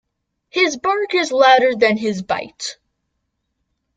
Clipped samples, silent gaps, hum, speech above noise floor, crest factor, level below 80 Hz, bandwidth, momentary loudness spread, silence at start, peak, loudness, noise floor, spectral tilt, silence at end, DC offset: under 0.1%; none; none; 57 dB; 18 dB; -62 dBFS; 9.2 kHz; 15 LU; 0.55 s; -2 dBFS; -16 LUFS; -73 dBFS; -3.5 dB/octave; 1.25 s; under 0.1%